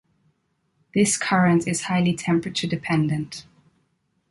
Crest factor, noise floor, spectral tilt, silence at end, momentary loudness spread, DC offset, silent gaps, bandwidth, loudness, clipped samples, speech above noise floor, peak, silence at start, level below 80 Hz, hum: 16 dB; -70 dBFS; -5 dB/octave; 0.9 s; 9 LU; under 0.1%; none; 11.5 kHz; -22 LUFS; under 0.1%; 49 dB; -8 dBFS; 0.95 s; -58 dBFS; none